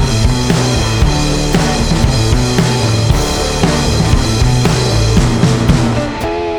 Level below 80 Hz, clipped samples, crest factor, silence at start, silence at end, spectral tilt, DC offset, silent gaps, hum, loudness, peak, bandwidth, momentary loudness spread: -18 dBFS; under 0.1%; 12 dB; 0 s; 0 s; -5 dB/octave; under 0.1%; none; none; -13 LUFS; 0 dBFS; 18.5 kHz; 2 LU